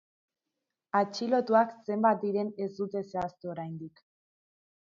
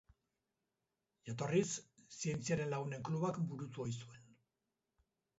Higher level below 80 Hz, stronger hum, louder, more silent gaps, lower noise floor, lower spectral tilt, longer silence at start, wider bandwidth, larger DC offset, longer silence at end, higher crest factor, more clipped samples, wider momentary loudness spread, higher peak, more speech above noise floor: about the same, -72 dBFS vs -74 dBFS; neither; first, -30 LUFS vs -41 LUFS; neither; about the same, -87 dBFS vs -89 dBFS; about the same, -6.5 dB/octave vs -6.5 dB/octave; second, 0.95 s vs 1.25 s; about the same, 7.6 kHz vs 8 kHz; neither; second, 0.95 s vs 1.15 s; about the same, 18 dB vs 22 dB; neither; about the same, 13 LU vs 13 LU; first, -12 dBFS vs -22 dBFS; first, 57 dB vs 50 dB